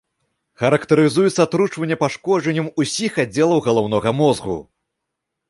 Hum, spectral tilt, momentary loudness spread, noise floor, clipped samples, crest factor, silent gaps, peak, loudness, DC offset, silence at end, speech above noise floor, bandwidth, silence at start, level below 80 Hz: none; -5.5 dB/octave; 6 LU; -79 dBFS; under 0.1%; 16 dB; none; -2 dBFS; -18 LUFS; under 0.1%; 0.9 s; 62 dB; 11.5 kHz; 0.6 s; -54 dBFS